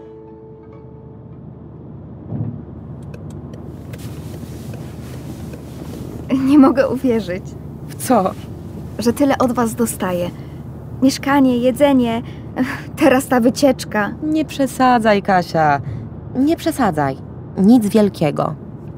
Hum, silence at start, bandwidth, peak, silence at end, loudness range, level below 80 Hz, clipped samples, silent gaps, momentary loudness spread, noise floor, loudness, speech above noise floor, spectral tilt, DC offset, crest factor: none; 0 s; 16 kHz; -2 dBFS; 0 s; 15 LU; -42 dBFS; under 0.1%; none; 22 LU; -37 dBFS; -16 LUFS; 22 dB; -6 dB/octave; under 0.1%; 16 dB